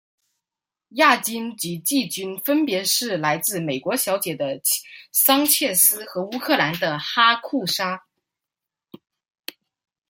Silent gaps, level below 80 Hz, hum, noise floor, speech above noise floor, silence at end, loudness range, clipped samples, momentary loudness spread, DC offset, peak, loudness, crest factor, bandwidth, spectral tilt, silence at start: none; -72 dBFS; none; -88 dBFS; 67 dB; 2.1 s; 4 LU; under 0.1%; 12 LU; under 0.1%; -2 dBFS; -20 LUFS; 22 dB; 16.5 kHz; -2 dB/octave; 0.95 s